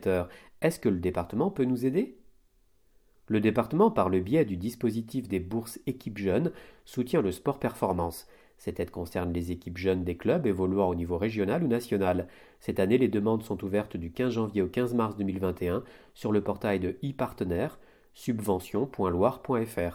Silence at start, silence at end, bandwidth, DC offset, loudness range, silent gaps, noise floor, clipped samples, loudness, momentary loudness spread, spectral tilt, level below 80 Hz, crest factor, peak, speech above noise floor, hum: 0 s; 0 s; 17.5 kHz; under 0.1%; 3 LU; none; -65 dBFS; under 0.1%; -29 LUFS; 9 LU; -7.5 dB/octave; -54 dBFS; 20 dB; -10 dBFS; 36 dB; none